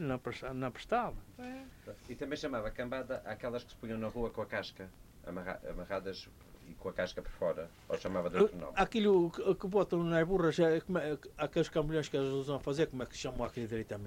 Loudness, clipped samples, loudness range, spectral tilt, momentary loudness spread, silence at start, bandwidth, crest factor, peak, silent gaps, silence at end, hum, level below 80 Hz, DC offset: -35 LUFS; under 0.1%; 10 LU; -6 dB/octave; 16 LU; 0 s; 16 kHz; 20 dB; -16 dBFS; none; 0 s; none; -54 dBFS; under 0.1%